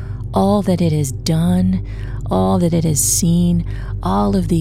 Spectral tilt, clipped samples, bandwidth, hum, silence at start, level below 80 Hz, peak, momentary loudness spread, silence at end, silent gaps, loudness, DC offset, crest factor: -6 dB/octave; under 0.1%; 16.5 kHz; none; 0 s; -28 dBFS; -2 dBFS; 9 LU; 0 s; none; -17 LUFS; 0.7%; 14 dB